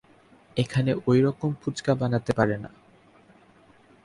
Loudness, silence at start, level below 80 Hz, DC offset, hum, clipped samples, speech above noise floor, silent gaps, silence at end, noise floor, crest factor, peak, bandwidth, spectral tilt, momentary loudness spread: -25 LUFS; 0.55 s; -56 dBFS; under 0.1%; none; under 0.1%; 32 dB; none; 1.35 s; -56 dBFS; 20 dB; -8 dBFS; 11.5 kHz; -7 dB/octave; 10 LU